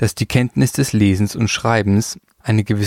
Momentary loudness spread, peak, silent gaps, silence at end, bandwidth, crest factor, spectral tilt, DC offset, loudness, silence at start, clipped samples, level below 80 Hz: 4 LU; -2 dBFS; none; 0 s; 16 kHz; 16 dB; -5.5 dB/octave; under 0.1%; -17 LUFS; 0 s; under 0.1%; -44 dBFS